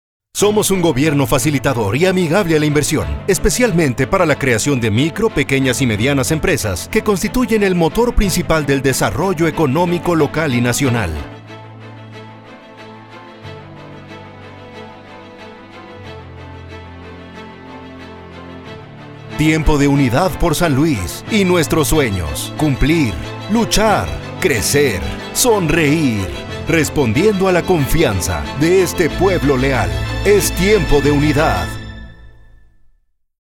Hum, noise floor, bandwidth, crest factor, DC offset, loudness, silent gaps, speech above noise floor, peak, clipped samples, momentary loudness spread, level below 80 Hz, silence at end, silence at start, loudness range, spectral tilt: none; -55 dBFS; 17.5 kHz; 16 dB; under 0.1%; -15 LUFS; none; 41 dB; 0 dBFS; under 0.1%; 21 LU; -28 dBFS; 1.2 s; 0.35 s; 20 LU; -5 dB/octave